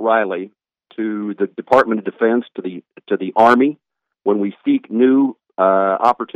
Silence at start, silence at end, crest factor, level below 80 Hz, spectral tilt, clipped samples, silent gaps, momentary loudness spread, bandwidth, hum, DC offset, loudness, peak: 0 s; 0.1 s; 16 dB; -62 dBFS; -7 dB/octave; under 0.1%; none; 15 LU; 8 kHz; none; under 0.1%; -17 LUFS; 0 dBFS